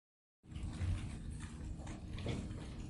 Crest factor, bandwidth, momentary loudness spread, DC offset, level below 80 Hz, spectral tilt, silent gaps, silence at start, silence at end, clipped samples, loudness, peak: 16 dB; 11.5 kHz; 7 LU; under 0.1%; -48 dBFS; -6.5 dB/octave; none; 0.45 s; 0 s; under 0.1%; -45 LUFS; -28 dBFS